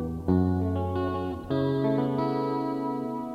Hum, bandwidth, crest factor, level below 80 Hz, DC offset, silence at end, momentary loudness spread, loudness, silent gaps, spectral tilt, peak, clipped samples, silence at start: none; 6.4 kHz; 16 dB; -48 dBFS; under 0.1%; 0 s; 5 LU; -28 LUFS; none; -9.5 dB/octave; -10 dBFS; under 0.1%; 0 s